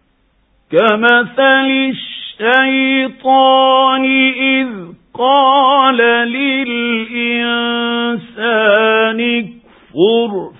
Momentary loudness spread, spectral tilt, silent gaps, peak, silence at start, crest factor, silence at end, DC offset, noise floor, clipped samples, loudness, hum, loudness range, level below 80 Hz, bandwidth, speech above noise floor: 9 LU; -7 dB/octave; none; 0 dBFS; 0.7 s; 12 dB; 0.1 s; under 0.1%; -57 dBFS; under 0.1%; -12 LUFS; none; 3 LU; -60 dBFS; 4 kHz; 45 dB